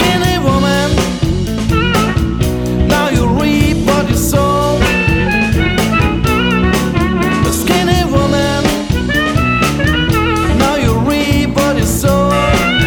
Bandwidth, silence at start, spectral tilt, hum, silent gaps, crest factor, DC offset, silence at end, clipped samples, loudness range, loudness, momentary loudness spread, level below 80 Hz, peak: over 20 kHz; 0 s; -5 dB/octave; none; none; 12 dB; under 0.1%; 0 s; under 0.1%; 1 LU; -12 LUFS; 3 LU; -22 dBFS; 0 dBFS